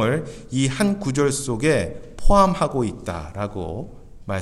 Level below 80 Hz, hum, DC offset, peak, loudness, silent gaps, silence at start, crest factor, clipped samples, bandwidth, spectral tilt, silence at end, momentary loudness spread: -30 dBFS; none; under 0.1%; -4 dBFS; -22 LUFS; none; 0 s; 18 dB; under 0.1%; 13 kHz; -5.5 dB/octave; 0 s; 14 LU